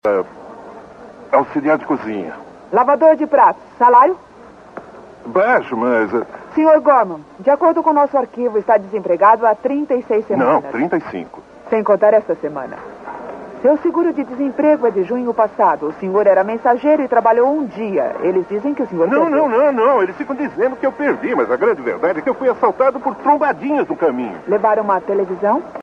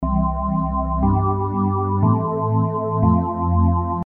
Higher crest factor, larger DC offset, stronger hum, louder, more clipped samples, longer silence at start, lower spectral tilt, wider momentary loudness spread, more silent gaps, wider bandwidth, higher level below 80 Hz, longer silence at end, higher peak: about the same, 14 dB vs 14 dB; neither; neither; first, -16 LUFS vs -20 LUFS; neither; about the same, 0.05 s vs 0 s; second, -8 dB/octave vs -13.5 dB/octave; first, 13 LU vs 3 LU; neither; first, 6.8 kHz vs 2.5 kHz; second, -58 dBFS vs -30 dBFS; about the same, 0 s vs 0.05 s; first, 0 dBFS vs -4 dBFS